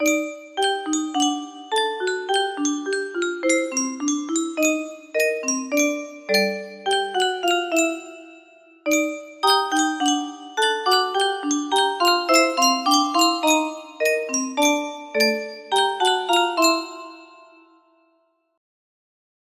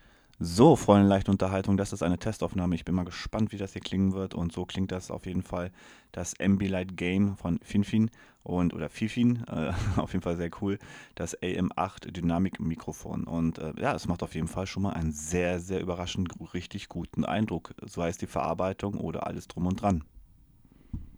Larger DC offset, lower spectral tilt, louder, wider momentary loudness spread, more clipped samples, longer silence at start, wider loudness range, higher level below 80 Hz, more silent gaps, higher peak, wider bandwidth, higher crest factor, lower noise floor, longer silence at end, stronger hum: neither; second, -1 dB/octave vs -6.5 dB/octave; first, -21 LUFS vs -30 LUFS; about the same, 8 LU vs 10 LU; neither; second, 0 s vs 0.4 s; about the same, 4 LU vs 5 LU; second, -72 dBFS vs -48 dBFS; neither; about the same, -4 dBFS vs -6 dBFS; second, 15.5 kHz vs over 20 kHz; second, 18 dB vs 24 dB; first, -66 dBFS vs -58 dBFS; first, 2.3 s vs 0 s; neither